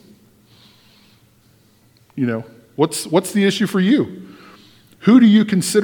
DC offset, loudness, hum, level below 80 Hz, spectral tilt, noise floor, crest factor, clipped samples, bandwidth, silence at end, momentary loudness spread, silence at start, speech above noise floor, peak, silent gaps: under 0.1%; -16 LUFS; none; -64 dBFS; -5.5 dB/octave; -54 dBFS; 18 dB; under 0.1%; 18.5 kHz; 0 s; 17 LU; 2.15 s; 39 dB; 0 dBFS; none